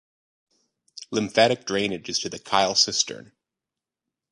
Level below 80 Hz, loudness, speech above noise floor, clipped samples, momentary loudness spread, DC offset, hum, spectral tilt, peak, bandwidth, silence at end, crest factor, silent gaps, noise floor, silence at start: -64 dBFS; -23 LUFS; 64 dB; under 0.1%; 10 LU; under 0.1%; none; -2 dB/octave; -4 dBFS; 11.5 kHz; 1.1 s; 24 dB; none; -88 dBFS; 0.95 s